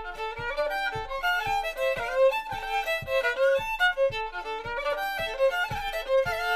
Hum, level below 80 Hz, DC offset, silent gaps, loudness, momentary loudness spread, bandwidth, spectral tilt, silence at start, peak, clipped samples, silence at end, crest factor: none; -46 dBFS; under 0.1%; none; -27 LUFS; 8 LU; 15.5 kHz; -2.5 dB/octave; 0 s; -12 dBFS; under 0.1%; 0 s; 16 dB